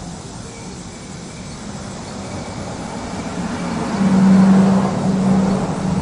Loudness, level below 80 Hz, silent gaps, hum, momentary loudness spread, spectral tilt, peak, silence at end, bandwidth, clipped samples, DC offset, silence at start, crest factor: -17 LUFS; -42 dBFS; none; none; 20 LU; -7 dB/octave; -2 dBFS; 0 s; 10.5 kHz; under 0.1%; under 0.1%; 0 s; 16 dB